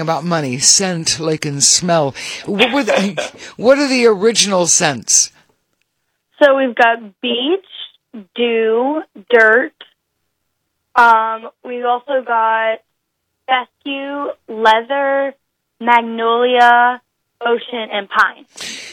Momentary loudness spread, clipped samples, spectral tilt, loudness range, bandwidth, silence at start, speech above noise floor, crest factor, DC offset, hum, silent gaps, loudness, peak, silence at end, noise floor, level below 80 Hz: 15 LU; under 0.1%; -2 dB/octave; 4 LU; 17 kHz; 0 s; 57 dB; 16 dB; under 0.1%; none; none; -14 LUFS; 0 dBFS; 0 s; -72 dBFS; -60 dBFS